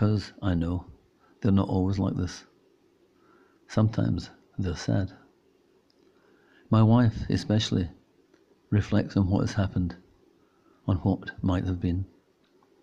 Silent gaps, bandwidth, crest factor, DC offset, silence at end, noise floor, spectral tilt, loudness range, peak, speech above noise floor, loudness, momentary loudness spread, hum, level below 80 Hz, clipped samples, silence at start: none; 7.8 kHz; 18 dB; under 0.1%; 0.75 s; -64 dBFS; -7.5 dB/octave; 5 LU; -10 dBFS; 39 dB; -27 LUFS; 12 LU; none; -50 dBFS; under 0.1%; 0 s